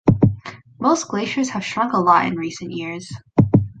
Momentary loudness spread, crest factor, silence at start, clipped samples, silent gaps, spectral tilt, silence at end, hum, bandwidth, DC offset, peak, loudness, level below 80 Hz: 13 LU; 18 dB; 0.05 s; under 0.1%; none; -6.5 dB/octave; 0.05 s; none; 9.2 kHz; under 0.1%; -2 dBFS; -20 LUFS; -42 dBFS